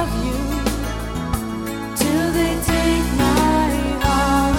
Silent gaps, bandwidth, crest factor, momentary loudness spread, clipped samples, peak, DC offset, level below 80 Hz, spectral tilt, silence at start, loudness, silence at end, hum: none; 17.5 kHz; 16 dB; 9 LU; under 0.1%; -4 dBFS; under 0.1%; -26 dBFS; -5 dB/octave; 0 s; -20 LUFS; 0 s; none